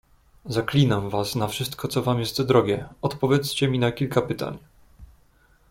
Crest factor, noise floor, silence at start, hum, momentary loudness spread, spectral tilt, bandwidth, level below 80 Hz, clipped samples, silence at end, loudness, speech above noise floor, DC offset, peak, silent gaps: 20 dB; -59 dBFS; 0.45 s; none; 9 LU; -6 dB/octave; 16.5 kHz; -52 dBFS; under 0.1%; 0.65 s; -24 LUFS; 35 dB; under 0.1%; -4 dBFS; none